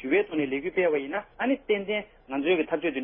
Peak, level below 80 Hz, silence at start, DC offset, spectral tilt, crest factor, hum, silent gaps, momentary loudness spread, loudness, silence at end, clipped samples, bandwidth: -12 dBFS; -60 dBFS; 0 s; under 0.1%; -9.5 dB/octave; 16 dB; none; none; 6 LU; -27 LUFS; 0 s; under 0.1%; 3.6 kHz